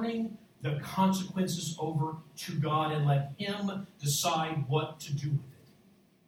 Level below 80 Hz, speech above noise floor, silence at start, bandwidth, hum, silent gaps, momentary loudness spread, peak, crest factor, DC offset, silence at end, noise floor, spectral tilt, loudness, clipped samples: -70 dBFS; 31 dB; 0 s; 17 kHz; none; none; 8 LU; -14 dBFS; 18 dB; under 0.1%; 0.75 s; -63 dBFS; -5 dB/octave; -32 LUFS; under 0.1%